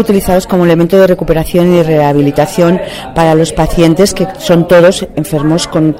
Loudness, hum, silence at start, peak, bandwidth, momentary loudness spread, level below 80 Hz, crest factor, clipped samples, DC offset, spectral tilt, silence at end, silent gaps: -9 LUFS; none; 0 s; 0 dBFS; 16.5 kHz; 6 LU; -28 dBFS; 8 dB; 0.6%; under 0.1%; -6 dB/octave; 0 s; none